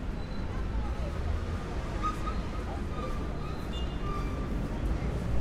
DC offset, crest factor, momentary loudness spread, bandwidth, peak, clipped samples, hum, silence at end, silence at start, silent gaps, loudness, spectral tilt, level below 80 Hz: under 0.1%; 14 dB; 3 LU; 12 kHz; -18 dBFS; under 0.1%; none; 0 s; 0 s; none; -35 LUFS; -7 dB/octave; -34 dBFS